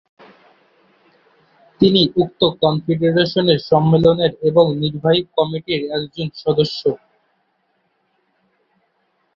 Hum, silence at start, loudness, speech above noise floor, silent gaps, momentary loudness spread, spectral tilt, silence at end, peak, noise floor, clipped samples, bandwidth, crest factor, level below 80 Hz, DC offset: none; 1.8 s; -17 LUFS; 50 dB; none; 9 LU; -8 dB/octave; 2.4 s; 0 dBFS; -66 dBFS; under 0.1%; 7 kHz; 18 dB; -52 dBFS; under 0.1%